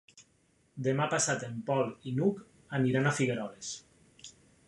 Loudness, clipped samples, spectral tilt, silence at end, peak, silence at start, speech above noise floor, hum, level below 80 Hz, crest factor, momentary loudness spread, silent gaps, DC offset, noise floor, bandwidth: -31 LUFS; under 0.1%; -5 dB/octave; 0.4 s; -14 dBFS; 0.15 s; 38 dB; none; -70 dBFS; 18 dB; 23 LU; none; under 0.1%; -69 dBFS; 11.5 kHz